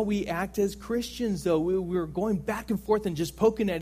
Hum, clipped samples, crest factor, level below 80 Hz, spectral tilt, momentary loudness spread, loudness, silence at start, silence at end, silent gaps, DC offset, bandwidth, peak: none; under 0.1%; 18 dB; -48 dBFS; -6 dB/octave; 6 LU; -28 LUFS; 0 s; 0 s; none; under 0.1%; 15.5 kHz; -10 dBFS